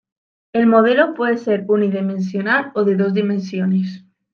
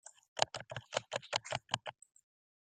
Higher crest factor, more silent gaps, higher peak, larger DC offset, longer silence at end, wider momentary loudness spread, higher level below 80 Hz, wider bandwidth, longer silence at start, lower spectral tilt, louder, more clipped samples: second, 16 dB vs 32 dB; second, none vs 0.28-0.36 s; first, -2 dBFS vs -10 dBFS; neither; second, 0.35 s vs 0.7 s; about the same, 8 LU vs 9 LU; first, -68 dBFS vs -74 dBFS; second, 6.8 kHz vs 9.8 kHz; first, 0.55 s vs 0.05 s; first, -8 dB/octave vs -1.5 dB/octave; first, -17 LUFS vs -39 LUFS; neither